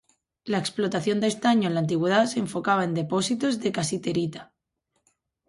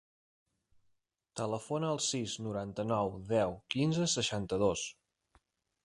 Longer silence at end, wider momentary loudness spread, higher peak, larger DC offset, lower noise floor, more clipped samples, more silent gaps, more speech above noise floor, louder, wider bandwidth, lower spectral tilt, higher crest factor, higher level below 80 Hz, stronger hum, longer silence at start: first, 1.05 s vs 0.9 s; about the same, 7 LU vs 8 LU; first, -8 dBFS vs -16 dBFS; neither; about the same, -76 dBFS vs -77 dBFS; neither; neither; first, 52 dB vs 44 dB; first, -25 LUFS vs -34 LUFS; about the same, 11.5 kHz vs 11.5 kHz; about the same, -5 dB/octave vs -4.5 dB/octave; about the same, 18 dB vs 20 dB; about the same, -66 dBFS vs -62 dBFS; neither; second, 0.45 s vs 1.35 s